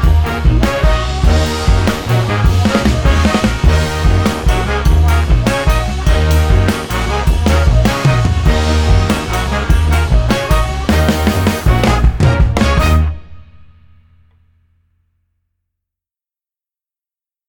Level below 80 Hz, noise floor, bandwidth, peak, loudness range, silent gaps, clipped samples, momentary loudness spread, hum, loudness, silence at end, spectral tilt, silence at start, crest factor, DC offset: -16 dBFS; under -90 dBFS; 19 kHz; 0 dBFS; 2 LU; none; under 0.1%; 3 LU; none; -13 LUFS; 4.05 s; -6 dB/octave; 0 s; 12 dB; under 0.1%